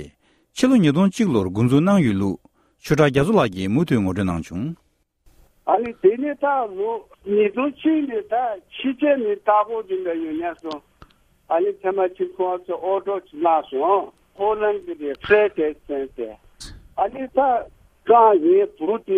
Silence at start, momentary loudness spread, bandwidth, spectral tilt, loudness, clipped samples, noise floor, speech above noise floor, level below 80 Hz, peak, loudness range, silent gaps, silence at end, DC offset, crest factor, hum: 0 s; 15 LU; 14 kHz; -7 dB/octave; -20 LUFS; under 0.1%; -58 dBFS; 38 dB; -52 dBFS; -4 dBFS; 4 LU; none; 0 s; under 0.1%; 18 dB; none